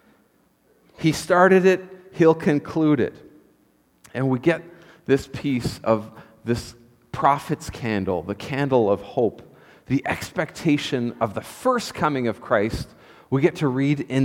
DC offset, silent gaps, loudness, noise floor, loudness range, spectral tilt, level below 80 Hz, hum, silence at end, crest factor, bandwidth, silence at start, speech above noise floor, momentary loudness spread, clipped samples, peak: under 0.1%; none; -22 LUFS; -61 dBFS; 5 LU; -6.5 dB/octave; -50 dBFS; none; 0 s; 20 dB; 16.5 kHz; 1 s; 40 dB; 10 LU; under 0.1%; -2 dBFS